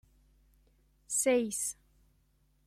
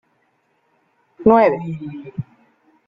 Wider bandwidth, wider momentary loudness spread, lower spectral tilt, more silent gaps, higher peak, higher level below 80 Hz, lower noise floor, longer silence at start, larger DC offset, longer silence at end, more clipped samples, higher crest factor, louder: first, 16 kHz vs 5.4 kHz; second, 10 LU vs 19 LU; second, -2.5 dB/octave vs -10 dB/octave; neither; second, -16 dBFS vs -2 dBFS; second, -68 dBFS vs -54 dBFS; first, -70 dBFS vs -64 dBFS; about the same, 1.1 s vs 1.2 s; neither; first, 0.95 s vs 0.65 s; neither; about the same, 20 dB vs 20 dB; second, -31 LUFS vs -17 LUFS